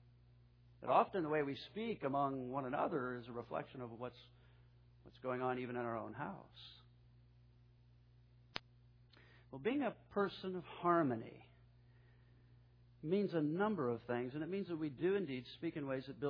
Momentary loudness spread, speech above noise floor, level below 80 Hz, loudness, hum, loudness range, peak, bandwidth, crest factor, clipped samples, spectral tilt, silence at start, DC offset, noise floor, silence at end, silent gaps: 15 LU; 26 dB; -72 dBFS; -41 LUFS; 60 Hz at -65 dBFS; 9 LU; -16 dBFS; 5.4 kHz; 26 dB; under 0.1%; -5.5 dB/octave; 0.8 s; under 0.1%; -67 dBFS; 0 s; none